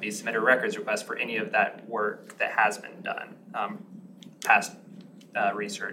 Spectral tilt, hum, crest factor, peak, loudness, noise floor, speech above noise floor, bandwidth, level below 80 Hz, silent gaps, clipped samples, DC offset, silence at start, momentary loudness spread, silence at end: -3 dB/octave; none; 24 dB; -6 dBFS; -27 LUFS; -48 dBFS; 20 dB; 16 kHz; under -90 dBFS; none; under 0.1%; under 0.1%; 0 s; 14 LU; 0 s